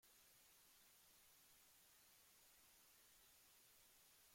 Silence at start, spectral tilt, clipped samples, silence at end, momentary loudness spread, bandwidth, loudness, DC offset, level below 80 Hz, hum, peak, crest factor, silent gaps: 0 s; 0 dB/octave; under 0.1%; 0 s; 0 LU; 16.5 kHz; -69 LUFS; under 0.1%; under -90 dBFS; none; -60 dBFS; 14 dB; none